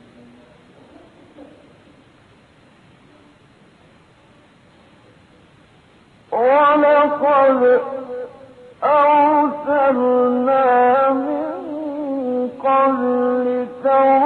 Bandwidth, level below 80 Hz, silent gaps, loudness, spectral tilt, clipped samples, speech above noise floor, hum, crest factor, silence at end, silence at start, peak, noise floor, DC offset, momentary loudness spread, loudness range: 4.4 kHz; -64 dBFS; none; -16 LUFS; -7 dB/octave; under 0.1%; 37 dB; none; 14 dB; 0 s; 1.4 s; -4 dBFS; -50 dBFS; under 0.1%; 13 LU; 4 LU